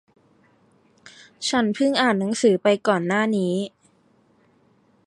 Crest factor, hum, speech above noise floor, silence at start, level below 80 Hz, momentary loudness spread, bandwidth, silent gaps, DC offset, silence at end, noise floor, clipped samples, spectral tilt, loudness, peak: 18 dB; none; 40 dB; 1.05 s; -68 dBFS; 8 LU; 11.5 kHz; none; under 0.1%; 1.4 s; -60 dBFS; under 0.1%; -4.5 dB/octave; -21 LUFS; -6 dBFS